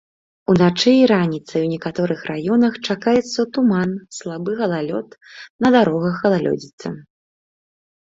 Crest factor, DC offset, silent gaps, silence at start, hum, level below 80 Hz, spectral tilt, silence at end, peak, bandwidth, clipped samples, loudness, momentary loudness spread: 16 dB; under 0.1%; 5.50-5.59 s, 6.73-6.78 s; 0.5 s; none; -58 dBFS; -6 dB/octave; 1.1 s; -2 dBFS; 7.8 kHz; under 0.1%; -18 LUFS; 16 LU